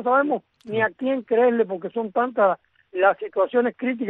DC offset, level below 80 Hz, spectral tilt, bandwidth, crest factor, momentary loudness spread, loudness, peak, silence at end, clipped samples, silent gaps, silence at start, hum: under 0.1%; -72 dBFS; -8.5 dB/octave; 4 kHz; 16 dB; 9 LU; -22 LUFS; -6 dBFS; 0 s; under 0.1%; none; 0 s; none